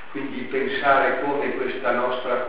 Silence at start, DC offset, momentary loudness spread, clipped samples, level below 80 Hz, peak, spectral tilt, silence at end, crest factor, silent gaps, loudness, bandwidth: 0 s; 2%; 9 LU; under 0.1%; -58 dBFS; -4 dBFS; -2 dB/octave; 0 s; 20 dB; none; -23 LUFS; 5.2 kHz